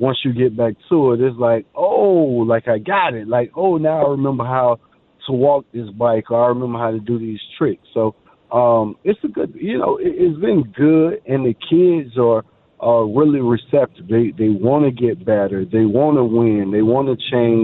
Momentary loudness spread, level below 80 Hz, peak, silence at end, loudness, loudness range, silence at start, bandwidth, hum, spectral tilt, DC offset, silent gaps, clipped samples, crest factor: 7 LU; -54 dBFS; -2 dBFS; 0 s; -17 LUFS; 3 LU; 0 s; 4.1 kHz; none; -11.5 dB/octave; under 0.1%; none; under 0.1%; 14 dB